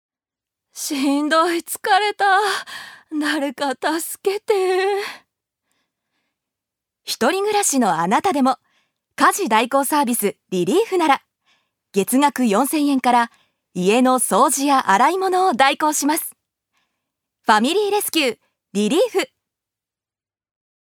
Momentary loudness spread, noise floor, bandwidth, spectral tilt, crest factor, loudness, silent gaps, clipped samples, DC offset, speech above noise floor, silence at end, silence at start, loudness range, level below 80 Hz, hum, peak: 10 LU; under -90 dBFS; 20 kHz; -3 dB/octave; 18 dB; -18 LUFS; none; under 0.1%; under 0.1%; over 72 dB; 1.75 s; 0.75 s; 6 LU; -74 dBFS; none; 0 dBFS